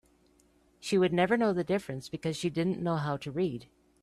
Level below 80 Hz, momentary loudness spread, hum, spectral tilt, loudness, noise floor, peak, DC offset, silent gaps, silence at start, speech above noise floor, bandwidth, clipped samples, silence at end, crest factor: -64 dBFS; 10 LU; none; -6 dB/octave; -30 LUFS; -66 dBFS; -14 dBFS; under 0.1%; none; 0.8 s; 36 dB; 13 kHz; under 0.1%; 0.4 s; 16 dB